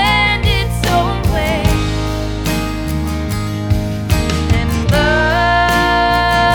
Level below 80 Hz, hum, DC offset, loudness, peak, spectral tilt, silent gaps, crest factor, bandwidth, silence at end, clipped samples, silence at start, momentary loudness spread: -22 dBFS; none; under 0.1%; -15 LUFS; 0 dBFS; -5 dB/octave; none; 14 dB; 19 kHz; 0 s; under 0.1%; 0 s; 7 LU